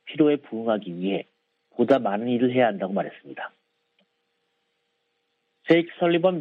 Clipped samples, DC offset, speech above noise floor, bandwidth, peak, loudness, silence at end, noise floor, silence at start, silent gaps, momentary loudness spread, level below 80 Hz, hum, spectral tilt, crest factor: under 0.1%; under 0.1%; 52 dB; 6.6 kHz; -6 dBFS; -24 LUFS; 0 s; -74 dBFS; 0.05 s; none; 16 LU; -74 dBFS; none; -8.5 dB/octave; 20 dB